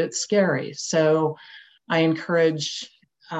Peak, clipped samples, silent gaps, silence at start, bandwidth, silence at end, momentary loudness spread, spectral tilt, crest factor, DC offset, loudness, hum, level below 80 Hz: -8 dBFS; under 0.1%; none; 0 s; 8.6 kHz; 0 s; 11 LU; -4.5 dB/octave; 16 dB; under 0.1%; -22 LUFS; none; -74 dBFS